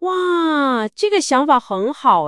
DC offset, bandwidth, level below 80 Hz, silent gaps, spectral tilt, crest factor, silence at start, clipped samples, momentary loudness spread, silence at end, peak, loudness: under 0.1%; 11.5 kHz; -64 dBFS; none; -3.5 dB/octave; 16 dB; 0 s; under 0.1%; 4 LU; 0 s; 0 dBFS; -17 LUFS